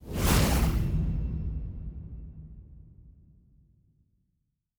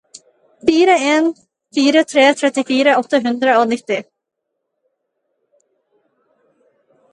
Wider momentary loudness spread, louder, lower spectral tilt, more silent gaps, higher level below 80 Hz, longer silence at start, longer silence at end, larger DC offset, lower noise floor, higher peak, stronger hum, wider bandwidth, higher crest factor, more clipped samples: first, 23 LU vs 9 LU; second, -29 LUFS vs -15 LUFS; first, -5 dB/octave vs -3 dB/octave; neither; first, -34 dBFS vs -64 dBFS; second, 0 s vs 0.65 s; second, 1.7 s vs 3.1 s; neither; about the same, -78 dBFS vs -76 dBFS; second, -12 dBFS vs 0 dBFS; neither; first, over 20 kHz vs 11 kHz; about the same, 20 dB vs 18 dB; neither